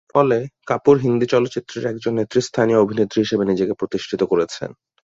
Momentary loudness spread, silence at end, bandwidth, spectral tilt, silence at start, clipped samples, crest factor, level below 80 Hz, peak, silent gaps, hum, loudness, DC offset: 9 LU; 0.3 s; 7.8 kHz; -6 dB/octave; 0.15 s; under 0.1%; 18 dB; -56 dBFS; -2 dBFS; none; none; -19 LUFS; under 0.1%